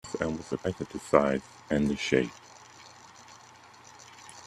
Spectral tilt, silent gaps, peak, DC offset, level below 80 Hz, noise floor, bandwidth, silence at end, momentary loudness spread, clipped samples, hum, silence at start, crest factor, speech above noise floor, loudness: -5.5 dB/octave; none; -4 dBFS; under 0.1%; -56 dBFS; -53 dBFS; 13 kHz; 0 s; 25 LU; under 0.1%; none; 0.05 s; 28 dB; 25 dB; -29 LUFS